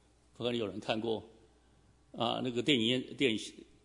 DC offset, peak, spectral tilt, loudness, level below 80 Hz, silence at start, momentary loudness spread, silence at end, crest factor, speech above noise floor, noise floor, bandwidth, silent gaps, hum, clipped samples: under 0.1%; -14 dBFS; -4.5 dB/octave; -34 LUFS; -70 dBFS; 0.4 s; 10 LU; 0.2 s; 22 dB; 32 dB; -65 dBFS; 11 kHz; none; none; under 0.1%